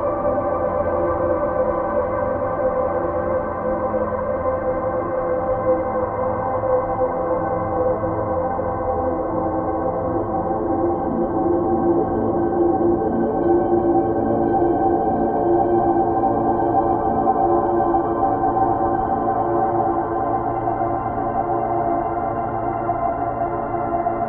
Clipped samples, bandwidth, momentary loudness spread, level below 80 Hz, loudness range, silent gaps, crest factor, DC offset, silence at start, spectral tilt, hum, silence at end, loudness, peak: under 0.1%; 3.3 kHz; 5 LU; -40 dBFS; 4 LU; none; 14 dB; under 0.1%; 0 s; -13 dB/octave; none; 0 s; -20 LUFS; -4 dBFS